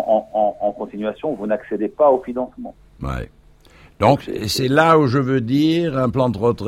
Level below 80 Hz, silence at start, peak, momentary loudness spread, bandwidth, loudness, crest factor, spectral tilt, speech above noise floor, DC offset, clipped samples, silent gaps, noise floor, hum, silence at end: -42 dBFS; 0 s; 0 dBFS; 14 LU; 16.5 kHz; -19 LUFS; 18 dB; -6.5 dB/octave; 30 dB; under 0.1%; under 0.1%; none; -48 dBFS; none; 0 s